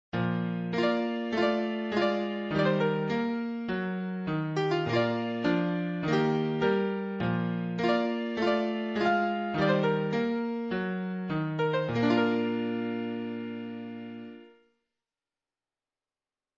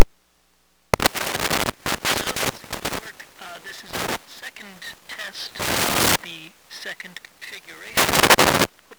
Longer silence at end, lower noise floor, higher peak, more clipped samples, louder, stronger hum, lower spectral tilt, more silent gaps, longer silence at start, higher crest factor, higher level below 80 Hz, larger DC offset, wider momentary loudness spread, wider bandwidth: first, 2.1 s vs 0.05 s; first, under -90 dBFS vs -63 dBFS; second, -12 dBFS vs 0 dBFS; second, under 0.1% vs 0.2%; second, -29 LUFS vs -21 LUFS; neither; first, -7.5 dB/octave vs -2 dB/octave; neither; first, 0.15 s vs 0 s; about the same, 18 dB vs 22 dB; second, -64 dBFS vs -44 dBFS; neither; second, 7 LU vs 21 LU; second, 7.8 kHz vs over 20 kHz